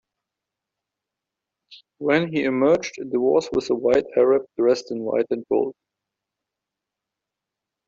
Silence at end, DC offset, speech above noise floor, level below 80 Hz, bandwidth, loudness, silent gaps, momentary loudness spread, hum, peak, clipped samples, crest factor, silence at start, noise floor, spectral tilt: 2.15 s; under 0.1%; 65 dB; -62 dBFS; 7.6 kHz; -22 LUFS; none; 5 LU; none; -6 dBFS; under 0.1%; 18 dB; 1.7 s; -86 dBFS; -5.5 dB/octave